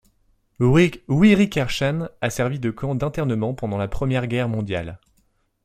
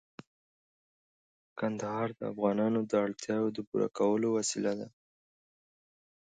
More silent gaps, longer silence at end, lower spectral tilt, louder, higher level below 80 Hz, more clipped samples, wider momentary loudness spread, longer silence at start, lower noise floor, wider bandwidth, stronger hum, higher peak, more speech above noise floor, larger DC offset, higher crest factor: second, none vs 3.67-3.72 s; second, 0.7 s vs 1.4 s; first, -6.5 dB/octave vs -5 dB/octave; first, -21 LUFS vs -32 LUFS; first, -42 dBFS vs -76 dBFS; neither; first, 10 LU vs 7 LU; second, 0.6 s vs 1.55 s; second, -65 dBFS vs under -90 dBFS; first, 15 kHz vs 9.6 kHz; neither; first, -4 dBFS vs -14 dBFS; second, 44 dB vs over 59 dB; neither; about the same, 18 dB vs 20 dB